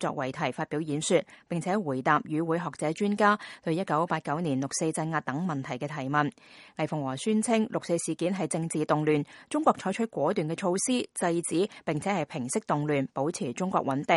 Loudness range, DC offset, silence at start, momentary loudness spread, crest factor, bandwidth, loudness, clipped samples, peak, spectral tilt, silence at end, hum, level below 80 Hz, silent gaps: 2 LU; under 0.1%; 0 s; 6 LU; 20 dB; 11.5 kHz; -29 LUFS; under 0.1%; -8 dBFS; -5 dB/octave; 0 s; none; -70 dBFS; none